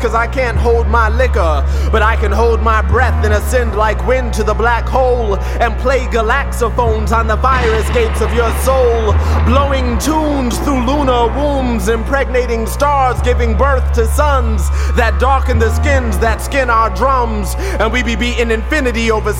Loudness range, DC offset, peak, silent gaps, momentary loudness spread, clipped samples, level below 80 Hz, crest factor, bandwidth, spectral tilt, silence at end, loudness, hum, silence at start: 1 LU; 0.3%; 0 dBFS; none; 3 LU; under 0.1%; -16 dBFS; 12 dB; 16 kHz; -6 dB/octave; 0 s; -13 LUFS; none; 0 s